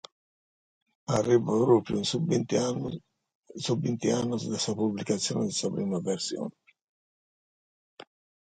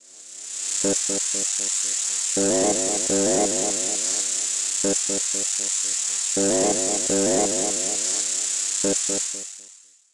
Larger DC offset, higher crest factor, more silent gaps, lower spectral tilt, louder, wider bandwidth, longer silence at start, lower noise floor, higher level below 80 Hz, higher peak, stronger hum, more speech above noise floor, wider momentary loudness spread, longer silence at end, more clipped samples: neither; about the same, 20 dB vs 16 dB; first, 3.35-3.43 s vs none; first, -5 dB/octave vs -1.5 dB/octave; second, -28 LUFS vs -21 LUFS; second, 9.6 kHz vs 11.5 kHz; first, 1.1 s vs 0.1 s; first, under -90 dBFS vs -49 dBFS; second, -64 dBFS vs -58 dBFS; about the same, -10 dBFS vs -8 dBFS; neither; first, over 63 dB vs 27 dB; first, 13 LU vs 4 LU; first, 1.95 s vs 0.4 s; neither